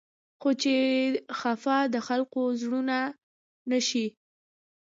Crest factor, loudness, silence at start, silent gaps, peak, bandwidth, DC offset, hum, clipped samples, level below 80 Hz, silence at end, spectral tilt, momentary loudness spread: 16 dB; -28 LUFS; 0.4 s; 3.23-3.66 s; -12 dBFS; 7.8 kHz; under 0.1%; none; under 0.1%; -82 dBFS; 0.75 s; -3 dB/octave; 7 LU